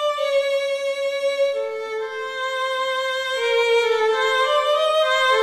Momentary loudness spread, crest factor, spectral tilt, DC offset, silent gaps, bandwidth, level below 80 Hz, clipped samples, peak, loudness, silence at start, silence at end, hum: 8 LU; 14 dB; 1 dB/octave; under 0.1%; none; 14 kHz; -68 dBFS; under 0.1%; -8 dBFS; -21 LUFS; 0 s; 0 s; none